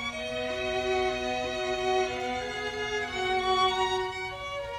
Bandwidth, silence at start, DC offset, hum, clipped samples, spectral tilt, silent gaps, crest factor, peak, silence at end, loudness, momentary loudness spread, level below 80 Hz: 13 kHz; 0 s; under 0.1%; none; under 0.1%; -3.5 dB/octave; none; 16 dB; -14 dBFS; 0 s; -29 LUFS; 7 LU; -52 dBFS